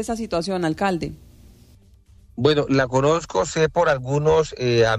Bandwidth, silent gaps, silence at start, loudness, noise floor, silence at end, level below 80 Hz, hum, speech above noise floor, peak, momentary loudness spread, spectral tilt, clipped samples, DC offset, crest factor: 12 kHz; none; 0 s; -21 LUFS; -51 dBFS; 0 s; -46 dBFS; none; 31 dB; -6 dBFS; 6 LU; -5.5 dB/octave; under 0.1%; under 0.1%; 14 dB